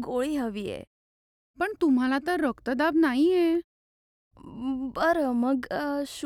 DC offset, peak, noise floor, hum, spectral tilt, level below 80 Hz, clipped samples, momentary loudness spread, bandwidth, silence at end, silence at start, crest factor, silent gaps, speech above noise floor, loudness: under 0.1%; -12 dBFS; under -90 dBFS; none; -5 dB/octave; -58 dBFS; under 0.1%; 11 LU; 14 kHz; 0 s; 0 s; 16 dB; 0.87-1.54 s, 3.64-4.31 s; over 64 dB; -26 LUFS